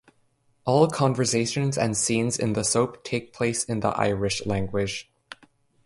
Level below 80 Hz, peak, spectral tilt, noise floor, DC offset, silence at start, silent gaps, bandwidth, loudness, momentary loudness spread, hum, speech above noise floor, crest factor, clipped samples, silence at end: -52 dBFS; -6 dBFS; -4.5 dB/octave; -66 dBFS; under 0.1%; 0.65 s; none; 11.5 kHz; -24 LUFS; 9 LU; none; 42 dB; 20 dB; under 0.1%; 0.5 s